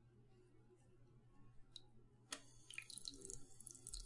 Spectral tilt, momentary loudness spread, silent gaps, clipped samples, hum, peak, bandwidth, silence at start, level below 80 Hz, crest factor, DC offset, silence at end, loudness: -1.5 dB/octave; 10 LU; none; under 0.1%; none; -30 dBFS; 11.5 kHz; 0 s; -68 dBFS; 28 dB; under 0.1%; 0 s; -55 LUFS